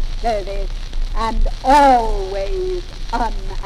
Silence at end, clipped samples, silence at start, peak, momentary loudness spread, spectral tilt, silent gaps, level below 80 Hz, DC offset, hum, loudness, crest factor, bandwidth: 0 s; under 0.1%; 0 s; -2 dBFS; 16 LU; -5 dB/octave; none; -22 dBFS; under 0.1%; none; -19 LUFS; 16 dB; 11.5 kHz